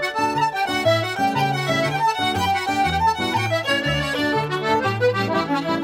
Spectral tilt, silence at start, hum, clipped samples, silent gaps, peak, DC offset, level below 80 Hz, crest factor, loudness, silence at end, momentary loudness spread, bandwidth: -4.5 dB/octave; 0 s; none; under 0.1%; none; -8 dBFS; under 0.1%; -46 dBFS; 14 dB; -20 LUFS; 0 s; 2 LU; 16.5 kHz